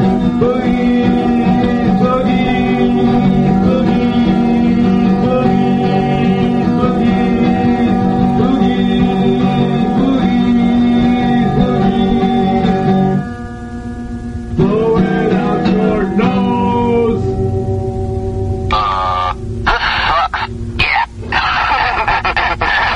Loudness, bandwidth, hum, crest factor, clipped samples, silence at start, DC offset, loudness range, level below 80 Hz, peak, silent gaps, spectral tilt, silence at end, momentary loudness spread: -13 LUFS; 8 kHz; none; 12 dB; under 0.1%; 0 s; under 0.1%; 3 LU; -28 dBFS; 0 dBFS; none; -8 dB/octave; 0 s; 6 LU